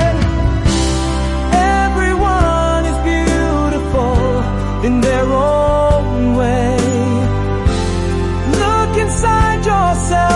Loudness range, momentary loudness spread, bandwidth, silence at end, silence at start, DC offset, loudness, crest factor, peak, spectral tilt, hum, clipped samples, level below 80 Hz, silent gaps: 1 LU; 4 LU; 11.5 kHz; 0 s; 0 s; under 0.1%; -15 LUFS; 10 dB; -2 dBFS; -6 dB/octave; none; under 0.1%; -20 dBFS; none